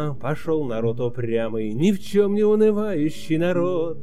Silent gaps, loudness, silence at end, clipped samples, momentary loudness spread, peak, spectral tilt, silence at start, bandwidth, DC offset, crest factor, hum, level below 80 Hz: none; -22 LUFS; 0 s; under 0.1%; 7 LU; -6 dBFS; -7.5 dB/octave; 0 s; 14.5 kHz; 4%; 14 dB; none; -52 dBFS